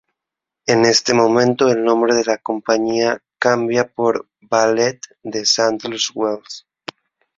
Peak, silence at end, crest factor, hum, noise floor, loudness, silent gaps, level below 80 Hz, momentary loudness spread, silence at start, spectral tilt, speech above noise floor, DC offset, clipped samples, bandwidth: 0 dBFS; 0.8 s; 18 dB; none; -84 dBFS; -17 LUFS; none; -60 dBFS; 14 LU; 0.65 s; -3.5 dB/octave; 68 dB; under 0.1%; under 0.1%; 7.8 kHz